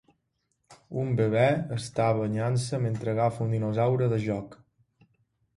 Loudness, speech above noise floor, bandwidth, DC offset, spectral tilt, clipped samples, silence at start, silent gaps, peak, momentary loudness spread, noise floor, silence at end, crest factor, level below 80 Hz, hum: -27 LUFS; 50 dB; 11.5 kHz; under 0.1%; -7 dB/octave; under 0.1%; 0.7 s; none; -10 dBFS; 9 LU; -77 dBFS; 1 s; 18 dB; -60 dBFS; none